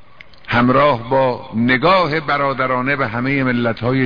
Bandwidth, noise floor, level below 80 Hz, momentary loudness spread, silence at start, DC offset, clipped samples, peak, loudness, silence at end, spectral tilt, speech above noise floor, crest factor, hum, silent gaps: 5.2 kHz; -40 dBFS; -44 dBFS; 5 LU; 0.45 s; 1%; under 0.1%; -2 dBFS; -16 LUFS; 0 s; -8 dB/octave; 24 dB; 14 dB; none; none